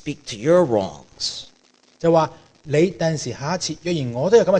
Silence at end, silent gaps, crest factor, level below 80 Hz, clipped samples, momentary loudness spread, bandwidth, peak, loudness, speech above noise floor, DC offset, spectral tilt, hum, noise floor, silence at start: 0 s; none; 18 dB; -54 dBFS; under 0.1%; 10 LU; 9.6 kHz; -2 dBFS; -21 LUFS; 37 dB; under 0.1%; -5.5 dB/octave; none; -57 dBFS; 0.05 s